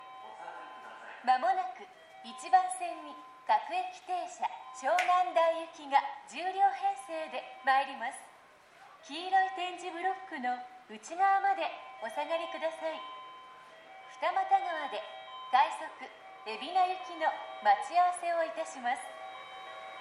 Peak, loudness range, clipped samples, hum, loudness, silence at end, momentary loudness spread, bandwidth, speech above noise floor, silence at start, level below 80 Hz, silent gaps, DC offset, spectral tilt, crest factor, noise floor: -14 dBFS; 4 LU; under 0.1%; none; -32 LUFS; 0 s; 19 LU; 11.5 kHz; 26 dB; 0 s; -88 dBFS; none; under 0.1%; -1 dB/octave; 20 dB; -58 dBFS